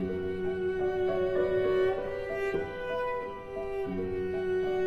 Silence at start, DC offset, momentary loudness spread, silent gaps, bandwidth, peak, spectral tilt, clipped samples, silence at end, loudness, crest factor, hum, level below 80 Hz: 0 s; under 0.1%; 7 LU; none; 6.2 kHz; -16 dBFS; -7.5 dB/octave; under 0.1%; 0 s; -31 LUFS; 14 dB; none; -52 dBFS